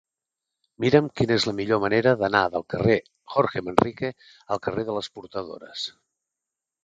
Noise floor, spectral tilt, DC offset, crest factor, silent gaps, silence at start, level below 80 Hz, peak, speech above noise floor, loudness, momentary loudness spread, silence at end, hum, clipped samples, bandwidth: -87 dBFS; -6 dB/octave; under 0.1%; 24 dB; none; 0.8 s; -54 dBFS; 0 dBFS; 63 dB; -24 LUFS; 13 LU; 0.95 s; none; under 0.1%; 9.6 kHz